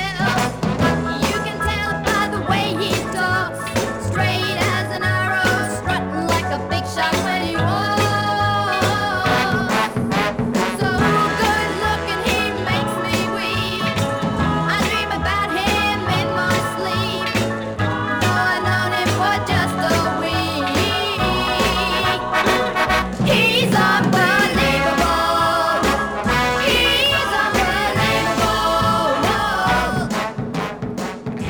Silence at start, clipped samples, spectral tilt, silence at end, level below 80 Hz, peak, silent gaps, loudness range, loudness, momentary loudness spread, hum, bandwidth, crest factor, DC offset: 0 s; under 0.1%; -4.5 dB/octave; 0 s; -36 dBFS; -6 dBFS; none; 4 LU; -18 LUFS; 6 LU; none; over 20 kHz; 14 dB; under 0.1%